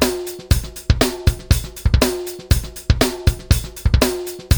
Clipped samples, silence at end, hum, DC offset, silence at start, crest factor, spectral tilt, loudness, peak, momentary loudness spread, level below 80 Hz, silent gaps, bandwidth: under 0.1%; 0 s; none; under 0.1%; 0 s; 16 dB; -5 dB/octave; -19 LUFS; 0 dBFS; 4 LU; -22 dBFS; none; over 20 kHz